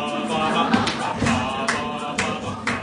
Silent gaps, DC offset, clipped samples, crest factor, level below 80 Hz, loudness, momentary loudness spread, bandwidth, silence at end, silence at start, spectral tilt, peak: none; under 0.1%; under 0.1%; 18 dB; -48 dBFS; -22 LUFS; 6 LU; 11 kHz; 0 s; 0 s; -4 dB/octave; -4 dBFS